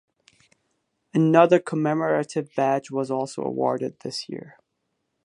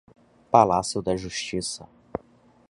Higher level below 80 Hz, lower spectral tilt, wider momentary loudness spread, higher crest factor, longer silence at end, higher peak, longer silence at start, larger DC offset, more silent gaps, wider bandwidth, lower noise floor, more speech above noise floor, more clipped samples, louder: second, -74 dBFS vs -52 dBFS; first, -6.5 dB/octave vs -4.5 dB/octave; second, 15 LU vs 19 LU; about the same, 22 dB vs 24 dB; first, 0.75 s vs 0.5 s; about the same, -2 dBFS vs -2 dBFS; first, 1.15 s vs 0.5 s; neither; neither; about the same, 11 kHz vs 11.5 kHz; first, -77 dBFS vs -57 dBFS; first, 54 dB vs 34 dB; neither; about the same, -23 LUFS vs -24 LUFS